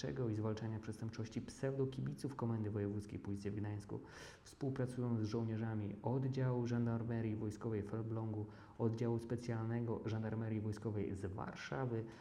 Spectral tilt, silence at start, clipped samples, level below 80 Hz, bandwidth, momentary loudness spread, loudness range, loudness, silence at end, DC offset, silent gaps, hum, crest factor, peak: -8 dB/octave; 0 s; under 0.1%; -68 dBFS; 11.5 kHz; 8 LU; 3 LU; -42 LUFS; 0 s; under 0.1%; none; none; 16 dB; -24 dBFS